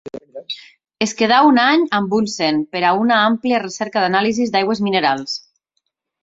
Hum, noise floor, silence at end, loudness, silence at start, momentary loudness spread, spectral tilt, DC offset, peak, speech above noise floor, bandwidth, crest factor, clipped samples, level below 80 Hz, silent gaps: none; -73 dBFS; 0.8 s; -16 LUFS; 0.05 s; 17 LU; -4 dB/octave; under 0.1%; -2 dBFS; 57 dB; 7.8 kHz; 16 dB; under 0.1%; -60 dBFS; none